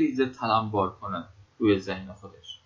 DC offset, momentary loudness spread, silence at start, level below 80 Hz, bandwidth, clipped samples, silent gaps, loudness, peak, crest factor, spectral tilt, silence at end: under 0.1%; 18 LU; 0 s; -56 dBFS; 7.6 kHz; under 0.1%; none; -27 LUFS; -10 dBFS; 18 dB; -7 dB/octave; 0.1 s